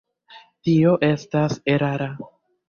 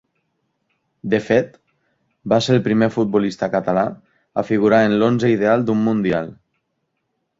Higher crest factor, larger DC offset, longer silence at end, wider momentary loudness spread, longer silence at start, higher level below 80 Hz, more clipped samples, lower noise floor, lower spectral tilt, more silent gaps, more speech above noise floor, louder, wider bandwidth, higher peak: about the same, 16 dB vs 18 dB; neither; second, 0.45 s vs 1.05 s; first, 14 LU vs 11 LU; second, 0.3 s vs 1.05 s; about the same, -58 dBFS vs -56 dBFS; neither; second, -49 dBFS vs -73 dBFS; about the same, -7.5 dB/octave vs -7 dB/octave; neither; second, 29 dB vs 56 dB; second, -21 LUFS vs -18 LUFS; second, 7 kHz vs 7.8 kHz; second, -6 dBFS vs -2 dBFS